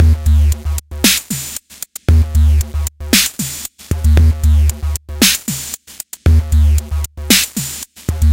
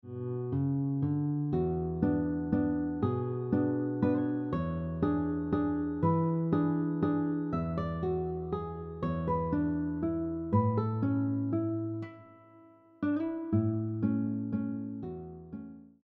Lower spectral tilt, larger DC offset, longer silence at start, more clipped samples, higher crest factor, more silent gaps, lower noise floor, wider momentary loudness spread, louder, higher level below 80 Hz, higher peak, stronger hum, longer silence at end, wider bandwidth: second, -3.5 dB/octave vs -10 dB/octave; neither; about the same, 0 s vs 0.05 s; neither; about the same, 14 dB vs 18 dB; neither; second, -33 dBFS vs -58 dBFS; first, 12 LU vs 8 LU; first, -14 LUFS vs -32 LUFS; first, -16 dBFS vs -52 dBFS; first, 0 dBFS vs -14 dBFS; neither; second, 0 s vs 0.2 s; first, 17 kHz vs 4.3 kHz